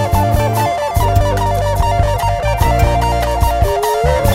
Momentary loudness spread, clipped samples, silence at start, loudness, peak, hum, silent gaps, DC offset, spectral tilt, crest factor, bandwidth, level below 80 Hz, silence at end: 2 LU; under 0.1%; 0 s; -15 LUFS; 0 dBFS; none; none; under 0.1%; -5.5 dB/octave; 12 dB; 16.5 kHz; -18 dBFS; 0 s